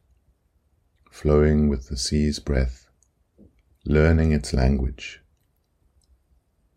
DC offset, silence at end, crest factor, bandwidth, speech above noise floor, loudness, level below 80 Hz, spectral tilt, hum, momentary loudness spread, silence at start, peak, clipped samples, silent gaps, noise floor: under 0.1%; 1.6 s; 20 dB; 11.5 kHz; 47 dB; -22 LUFS; -30 dBFS; -6.5 dB/octave; none; 12 LU; 1.15 s; -4 dBFS; under 0.1%; none; -67 dBFS